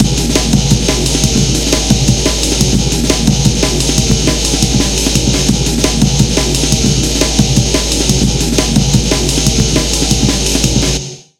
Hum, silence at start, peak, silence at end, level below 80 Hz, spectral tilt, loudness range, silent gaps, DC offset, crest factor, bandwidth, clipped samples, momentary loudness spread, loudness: none; 0 s; 0 dBFS; 0.2 s; -18 dBFS; -4 dB/octave; 0 LU; none; under 0.1%; 12 dB; 17 kHz; 0.1%; 1 LU; -11 LUFS